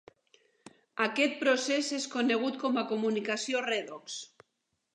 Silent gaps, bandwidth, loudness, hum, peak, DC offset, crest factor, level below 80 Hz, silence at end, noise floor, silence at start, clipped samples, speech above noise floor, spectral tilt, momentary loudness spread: none; 11 kHz; -30 LUFS; none; -12 dBFS; under 0.1%; 20 dB; -86 dBFS; 0.7 s; -81 dBFS; 0.95 s; under 0.1%; 51 dB; -2.5 dB/octave; 13 LU